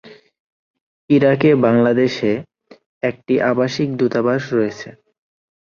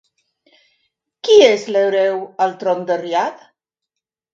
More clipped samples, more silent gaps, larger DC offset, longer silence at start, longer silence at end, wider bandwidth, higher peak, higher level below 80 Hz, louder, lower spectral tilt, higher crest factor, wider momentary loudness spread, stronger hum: neither; first, 0.40-0.74 s, 0.81-1.08 s, 2.86-3.01 s vs none; neither; second, 0.05 s vs 1.25 s; second, 0.85 s vs 1 s; about the same, 7.2 kHz vs 7.6 kHz; about the same, -2 dBFS vs 0 dBFS; first, -58 dBFS vs -70 dBFS; about the same, -17 LUFS vs -16 LUFS; first, -7 dB/octave vs -3.5 dB/octave; about the same, 16 dB vs 18 dB; about the same, 11 LU vs 10 LU; neither